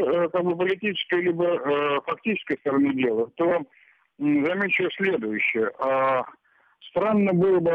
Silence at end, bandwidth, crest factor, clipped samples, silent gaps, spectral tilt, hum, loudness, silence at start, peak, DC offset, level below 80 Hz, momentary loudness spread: 0 s; 5 kHz; 12 dB; under 0.1%; none; -8.5 dB/octave; none; -24 LUFS; 0 s; -12 dBFS; under 0.1%; -66 dBFS; 6 LU